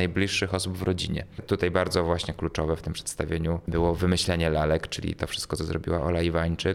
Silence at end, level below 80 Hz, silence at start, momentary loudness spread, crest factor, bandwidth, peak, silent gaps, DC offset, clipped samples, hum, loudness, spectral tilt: 0 s; -40 dBFS; 0 s; 6 LU; 18 dB; 15.5 kHz; -8 dBFS; none; under 0.1%; under 0.1%; none; -27 LUFS; -5 dB/octave